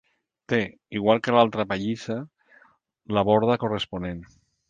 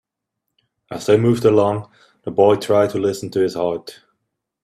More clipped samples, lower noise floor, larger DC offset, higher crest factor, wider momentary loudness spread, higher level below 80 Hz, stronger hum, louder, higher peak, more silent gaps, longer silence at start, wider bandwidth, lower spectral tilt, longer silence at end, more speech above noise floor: neither; second, -60 dBFS vs -79 dBFS; neither; about the same, 22 dB vs 18 dB; about the same, 13 LU vs 15 LU; about the same, -54 dBFS vs -56 dBFS; neither; second, -24 LUFS vs -18 LUFS; second, -4 dBFS vs 0 dBFS; neither; second, 0.5 s vs 0.9 s; second, 9 kHz vs 14 kHz; about the same, -6.5 dB/octave vs -6.5 dB/octave; second, 0.45 s vs 0.7 s; second, 36 dB vs 62 dB